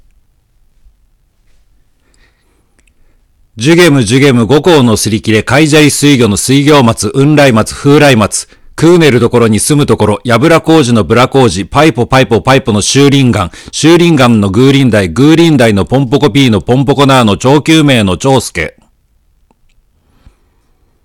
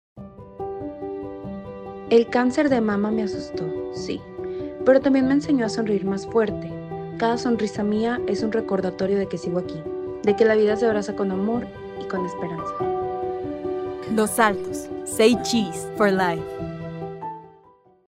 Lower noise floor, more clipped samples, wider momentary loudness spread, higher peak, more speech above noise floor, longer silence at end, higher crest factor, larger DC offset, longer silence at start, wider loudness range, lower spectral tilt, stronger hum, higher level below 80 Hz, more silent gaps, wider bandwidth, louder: about the same, -51 dBFS vs -54 dBFS; first, 3% vs under 0.1%; second, 5 LU vs 14 LU; first, 0 dBFS vs -4 dBFS; first, 45 dB vs 33 dB; first, 2.35 s vs 0.6 s; second, 8 dB vs 20 dB; neither; first, 3.55 s vs 0.15 s; about the same, 4 LU vs 3 LU; about the same, -5 dB/octave vs -5.5 dB/octave; neither; first, -36 dBFS vs -54 dBFS; neither; about the same, 17.5 kHz vs 16 kHz; first, -7 LUFS vs -23 LUFS